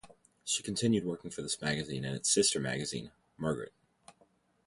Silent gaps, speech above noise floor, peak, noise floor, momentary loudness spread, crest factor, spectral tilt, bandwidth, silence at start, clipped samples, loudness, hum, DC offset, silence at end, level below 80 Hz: none; 36 dB; -14 dBFS; -70 dBFS; 14 LU; 20 dB; -3.5 dB/octave; 11.5 kHz; 0.05 s; under 0.1%; -33 LUFS; none; under 0.1%; 0.55 s; -64 dBFS